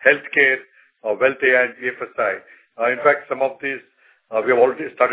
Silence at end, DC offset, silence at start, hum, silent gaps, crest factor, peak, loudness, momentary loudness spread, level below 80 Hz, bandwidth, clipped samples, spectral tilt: 0 s; under 0.1%; 0 s; none; none; 20 dB; 0 dBFS; -19 LUFS; 11 LU; -72 dBFS; 4 kHz; under 0.1%; -7 dB/octave